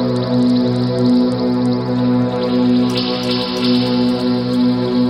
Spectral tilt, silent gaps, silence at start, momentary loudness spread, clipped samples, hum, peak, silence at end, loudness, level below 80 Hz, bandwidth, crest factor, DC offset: -7 dB/octave; none; 0 s; 3 LU; under 0.1%; none; -4 dBFS; 0 s; -16 LUFS; -46 dBFS; 9.8 kHz; 10 dB; under 0.1%